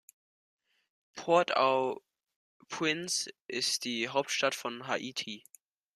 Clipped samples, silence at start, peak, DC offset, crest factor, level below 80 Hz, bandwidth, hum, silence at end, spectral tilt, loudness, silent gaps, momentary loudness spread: under 0.1%; 1.15 s; -12 dBFS; under 0.1%; 22 dB; -80 dBFS; 14.5 kHz; none; 0.55 s; -2 dB/octave; -31 LUFS; 2.36-2.60 s, 3.45-3.49 s; 15 LU